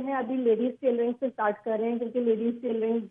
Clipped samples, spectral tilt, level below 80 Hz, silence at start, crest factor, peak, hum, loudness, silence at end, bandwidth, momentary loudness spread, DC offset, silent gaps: under 0.1%; -9 dB/octave; -78 dBFS; 0 s; 14 dB; -12 dBFS; none; -28 LUFS; 0 s; 3.7 kHz; 4 LU; under 0.1%; none